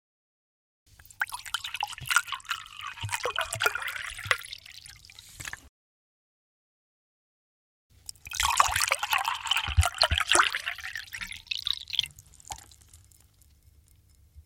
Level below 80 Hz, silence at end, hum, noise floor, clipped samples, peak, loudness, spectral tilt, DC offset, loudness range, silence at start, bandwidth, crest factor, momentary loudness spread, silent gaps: -46 dBFS; 0.05 s; 50 Hz at -65 dBFS; -60 dBFS; under 0.1%; -2 dBFS; -28 LUFS; -1 dB/octave; under 0.1%; 12 LU; 1.2 s; 17 kHz; 30 dB; 20 LU; 5.69-7.90 s